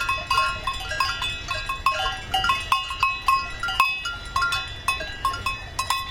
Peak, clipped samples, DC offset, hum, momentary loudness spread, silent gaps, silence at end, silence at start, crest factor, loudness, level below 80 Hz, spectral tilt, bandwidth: -4 dBFS; under 0.1%; under 0.1%; none; 6 LU; none; 0 s; 0 s; 22 dB; -24 LUFS; -40 dBFS; -1.5 dB/octave; 17 kHz